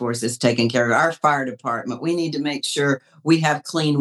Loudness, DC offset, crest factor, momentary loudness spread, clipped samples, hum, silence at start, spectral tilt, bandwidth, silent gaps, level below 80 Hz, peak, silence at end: -21 LUFS; under 0.1%; 18 dB; 7 LU; under 0.1%; none; 0 s; -4.5 dB/octave; 13.5 kHz; none; -76 dBFS; -2 dBFS; 0 s